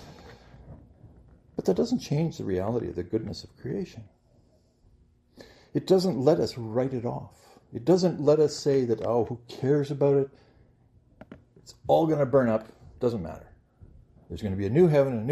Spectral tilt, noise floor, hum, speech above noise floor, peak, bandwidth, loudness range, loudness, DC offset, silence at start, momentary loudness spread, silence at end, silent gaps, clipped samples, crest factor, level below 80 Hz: -7.5 dB/octave; -62 dBFS; none; 37 dB; -6 dBFS; 13.5 kHz; 6 LU; -26 LUFS; under 0.1%; 0 s; 16 LU; 0 s; none; under 0.1%; 20 dB; -58 dBFS